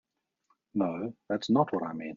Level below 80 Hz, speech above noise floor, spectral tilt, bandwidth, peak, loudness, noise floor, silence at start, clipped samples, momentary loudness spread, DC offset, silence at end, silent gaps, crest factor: -74 dBFS; 45 dB; -6 dB/octave; 7.2 kHz; -12 dBFS; -31 LUFS; -75 dBFS; 0.75 s; under 0.1%; 10 LU; under 0.1%; 0 s; none; 20 dB